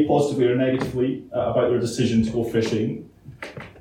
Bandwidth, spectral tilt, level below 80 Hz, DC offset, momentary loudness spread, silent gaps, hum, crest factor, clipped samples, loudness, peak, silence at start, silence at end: 15 kHz; -6.5 dB/octave; -50 dBFS; under 0.1%; 16 LU; none; none; 16 dB; under 0.1%; -22 LUFS; -6 dBFS; 0 s; 0 s